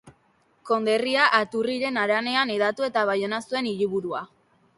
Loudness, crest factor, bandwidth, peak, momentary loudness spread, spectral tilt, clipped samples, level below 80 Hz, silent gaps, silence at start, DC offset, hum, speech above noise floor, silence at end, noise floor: -24 LUFS; 20 dB; 11.5 kHz; -6 dBFS; 8 LU; -4 dB/octave; under 0.1%; -70 dBFS; none; 0.05 s; under 0.1%; none; 40 dB; 0.5 s; -64 dBFS